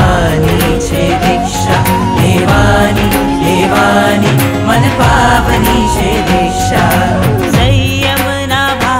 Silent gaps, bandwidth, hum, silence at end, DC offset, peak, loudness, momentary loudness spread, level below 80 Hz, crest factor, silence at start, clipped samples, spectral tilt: none; 16.5 kHz; none; 0 s; under 0.1%; 0 dBFS; -10 LUFS; 3 LU; -22 dBFS; 10 dB; 0 s; under 0.1%; -5 dB/octave